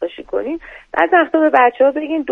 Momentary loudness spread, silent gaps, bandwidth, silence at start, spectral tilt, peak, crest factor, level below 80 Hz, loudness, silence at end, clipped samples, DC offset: 12 LU; none; 4.4 kHz; 0 s; -6 dB/octave; 0 dBFS; 16 dB; -52 dBFS; -15 LUFS; 0 s; under 0.1%; under 0.1%